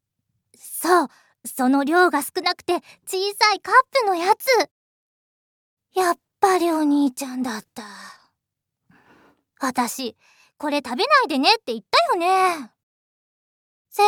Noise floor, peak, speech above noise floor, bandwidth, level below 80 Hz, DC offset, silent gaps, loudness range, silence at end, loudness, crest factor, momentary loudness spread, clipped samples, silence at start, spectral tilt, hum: -82 dBFS; -2 dBFS; 61 dB; 19 kHz; -74 dBFS; under 0.1%; 4.71-5.77 s, 12.83-13.85 s; 9 LU; 0 s; -20 LUFS; 20 dB; 14 LU; under 0.1%; 0.65 s; -2 dB/octave; none